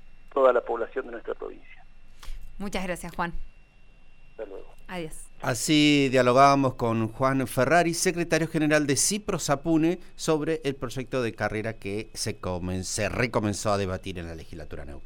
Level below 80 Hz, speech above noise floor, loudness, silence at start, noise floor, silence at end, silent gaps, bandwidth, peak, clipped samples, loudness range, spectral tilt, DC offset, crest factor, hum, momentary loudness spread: -44 dBFS; 24 dB; -25 LUFS; 0.05 s; -50 dBFS; 0 s; none; 18 kHz; -6 dBFS; under 0.1%; 14 LU; -4.5 dB/octave; under 0.1%; 20 dB; none; 19 LU